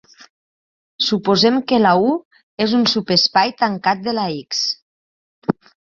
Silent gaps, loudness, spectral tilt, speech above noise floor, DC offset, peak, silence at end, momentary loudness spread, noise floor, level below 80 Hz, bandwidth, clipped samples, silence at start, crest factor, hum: 2.25-2.31 s, 2.43-2.57 s, 4.82-5.42 s; -17 LUFS; -4.5 dB/octave; over 73 dB; under 0.1%; 0 dBFS; 0.45 s; 10 LU; under -90 dBFS; -58 dBFS; 7.4 kHz; under 0.1%; 1 s; 18 dB; none